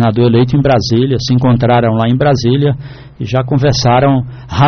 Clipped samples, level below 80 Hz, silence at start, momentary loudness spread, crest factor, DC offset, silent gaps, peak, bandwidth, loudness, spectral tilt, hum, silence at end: under 0.1%; -34 dBFS; 0 s; 7 LU; 10 dB; under 0.1%; none; -2 dBFS; 6.6 kHz; -11 LUFS; -6.5 dB/octave; none; 0 s